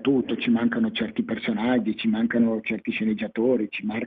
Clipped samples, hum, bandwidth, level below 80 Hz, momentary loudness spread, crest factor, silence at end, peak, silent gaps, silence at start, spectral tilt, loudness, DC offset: under 0.1%; none; 4.7 kHz; -62 dBFS; 5 LU; 14 dB; 0 s; -10 dBFS; none; 0 s; -9 dB/octave; -24 LUFS; under 0.1%